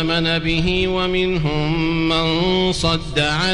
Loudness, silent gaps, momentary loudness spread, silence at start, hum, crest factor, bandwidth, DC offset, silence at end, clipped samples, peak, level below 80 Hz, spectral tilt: -18 LUFS; none; 2 LU; 0 s; none; 12 dB; 11 kHz; under 0.1%; 0 s; under 0.1%; -6 dBFS; -32 dBFS; -5 dB/octave